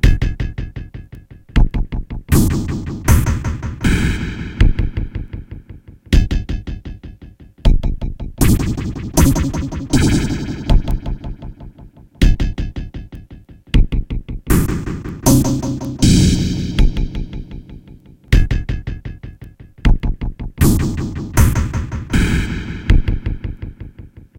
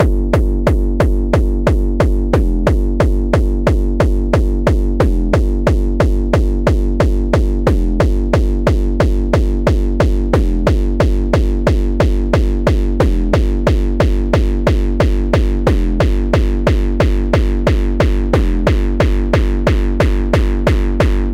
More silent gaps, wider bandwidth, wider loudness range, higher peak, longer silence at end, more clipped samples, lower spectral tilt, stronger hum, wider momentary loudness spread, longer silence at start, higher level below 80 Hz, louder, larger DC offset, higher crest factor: neither; first, 16.5 kHz vs 9.8 kHz; first, 6 LU vs 0 LU; about the same, 0 dBFS vs 0 dBFS; first, 0.15 s vs 0 s; neither; second, -5.5 dB/octave vs -7.5 dB/octave; neither; first, 19 LU vs 1 LU; about the same, 0.05 s vs 0 s; second, -20 dBFS vs -14 dBFS; second, -18 LUFS vs -15 LUFS; neither; about the same, 16 dB vs 12 dB